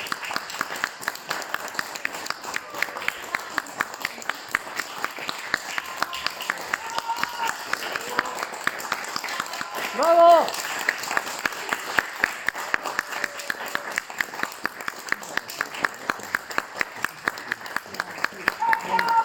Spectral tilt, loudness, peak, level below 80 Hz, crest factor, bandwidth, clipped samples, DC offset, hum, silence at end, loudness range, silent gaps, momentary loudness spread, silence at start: -1.5 dB/octave; -26 LUFS; -2 dBFS; -66 dBFS; 26 dB; 18 kHz; under 0.1%; under 0.1%; none; 0 s; 7 LU; none; 7 LU; 0 s